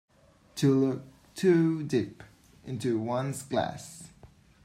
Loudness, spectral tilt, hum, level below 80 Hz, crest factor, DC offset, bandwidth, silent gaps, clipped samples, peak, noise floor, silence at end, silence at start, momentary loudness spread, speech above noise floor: -29 LUFS; -6.5 dB/octave; none; -64 dBFS; 18 dB; under 0.1%; 15.5 kHz; none; under 0.1%; -12 dBFS; -61 dBFS; 0.4 s; 0.55 s; 20 LU; 33 dB